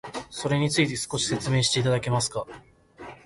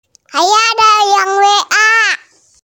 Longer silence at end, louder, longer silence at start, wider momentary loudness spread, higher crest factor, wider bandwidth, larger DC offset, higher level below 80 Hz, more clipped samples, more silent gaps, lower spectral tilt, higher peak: second, 0.1 s vs 0.5 s; second, -25 LUFS vs -9 LUFS; second, 0.05 s vs 0.35 s; first, 16 LU vs 6 LU; about the same, 16 dB vs 12 dB; second, 11.5 kHz vs 17 kHz; neither; first, -54 dBFS vs -62 dBFS; neither; neither; first, -4 dB/octave vs 1.5 dB/octave; second, -10 dBFS vs 0 dBFS